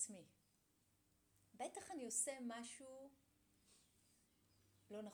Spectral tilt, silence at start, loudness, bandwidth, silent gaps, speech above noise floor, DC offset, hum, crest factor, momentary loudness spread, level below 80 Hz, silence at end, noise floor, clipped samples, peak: -2 dB/octave; 0 s; -48 LUFS; over 20 kHz; none; 31 dB; under 0.1%; none; 24 dB; 19 LU; -90 dBFS; 0 s; -81 dBFS; under 0.1%; -30 dBFS